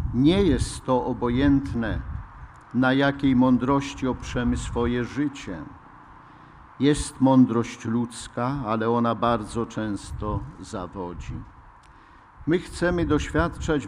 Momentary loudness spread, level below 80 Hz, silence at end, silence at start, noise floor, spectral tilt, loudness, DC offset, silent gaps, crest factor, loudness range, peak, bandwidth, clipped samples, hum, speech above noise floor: 15 LU; -38 dBFS; 0 s; 0 s; -50 dBFS; -6.5 dB/octave; -24 LUFS; under 0.1%; none; 16 dB; 6 LU; -8 dBFS; 11.5 kHz; under 0.1%; none; 27 dB